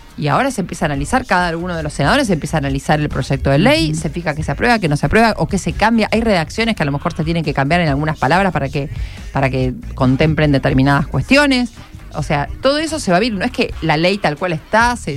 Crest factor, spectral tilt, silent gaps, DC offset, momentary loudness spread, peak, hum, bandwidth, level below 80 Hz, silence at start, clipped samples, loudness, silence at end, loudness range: 16 dB; -5.5 dB/octave; none; under 0.1%; 7 LU; 0 dBFS; none; 14 kHz; -30 dBFS; 0.05 s; under 0.1%; -16 LUFS; 0 s; 2 LU